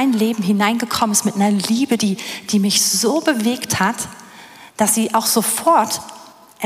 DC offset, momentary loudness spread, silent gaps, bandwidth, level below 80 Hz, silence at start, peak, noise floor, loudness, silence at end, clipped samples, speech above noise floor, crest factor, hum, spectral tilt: under 0.1%; 9 LU; none; 16 kHz; -60 dBFS; 0 s; -2 dBFS; -41 dBFS; -17 LUFS; 0 s; under 0.1%; 24 dB; 16 dB; none; -3 dB/octave